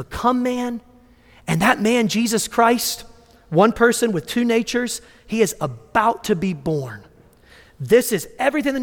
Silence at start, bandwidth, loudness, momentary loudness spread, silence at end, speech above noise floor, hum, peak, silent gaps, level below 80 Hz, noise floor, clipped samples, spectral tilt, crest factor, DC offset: 0 s; 18.5 kHz; -19 LUFS; 11 LU; 0 s; 31 dB; none; -2 dBFS; none; -50 dBFS; -50 dBFS; under 0.1%; -4.5 dB/octave; 18 dB; under 0.1%